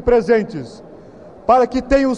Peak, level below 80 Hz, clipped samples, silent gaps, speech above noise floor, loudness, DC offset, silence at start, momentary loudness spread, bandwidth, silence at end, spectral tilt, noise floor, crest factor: -2 dBFS; -36 dBFS; under 0.1%; none; 24 dB; -16 LUFS; 0.2%; 0 s; 15 LU; 9 kHz; 0 s; -6.5 dB/octave; -40 dBFS; 14 dB